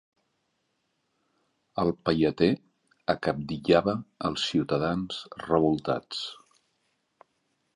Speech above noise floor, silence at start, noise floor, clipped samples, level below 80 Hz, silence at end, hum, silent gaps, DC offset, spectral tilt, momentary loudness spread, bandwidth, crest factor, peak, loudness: 49 dB; 1.75 s; -76 dBFS; under 0.1%; -56 dBFS; 1.4 s; none; none; under 0.1%; -6 dB/octave; 11 LU; 10.5 kHz; 24 dB; -6 dBFS; -28 LUFS